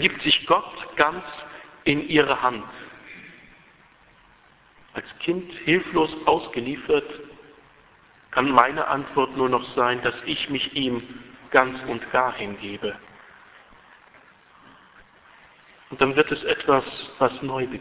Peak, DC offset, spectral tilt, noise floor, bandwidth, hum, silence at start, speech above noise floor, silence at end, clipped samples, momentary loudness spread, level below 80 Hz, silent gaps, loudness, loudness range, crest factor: 0 dBFS; under 0.1%; -8.5 dB/octave; -56 dBFS; 4 kHz; none; 0 s; 32 dB; 0 s; under 0.1%; 20 LU; -56 dBFS; none; -23 LUFS; 8 LU; 24 dB